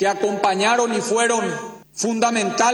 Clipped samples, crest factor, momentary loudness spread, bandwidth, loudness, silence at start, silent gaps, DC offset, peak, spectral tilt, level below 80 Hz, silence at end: under 0.1%; 18 dB; 9 LU; over 20 kHz; -19 LUFS; 0 s; none; under 0.1%; -2 dBFS; -3 dB/octave; -66 dBFS; 0 s